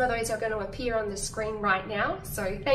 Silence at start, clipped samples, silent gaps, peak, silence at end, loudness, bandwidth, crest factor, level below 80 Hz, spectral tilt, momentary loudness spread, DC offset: 0 s; under 0.1%; none; -12 dBFS; 0 s; -29 LUFS; 15.5 kHz; 16 dB; -44 dBFS; -3.5 dB/octave; 5 LU; under 0.1%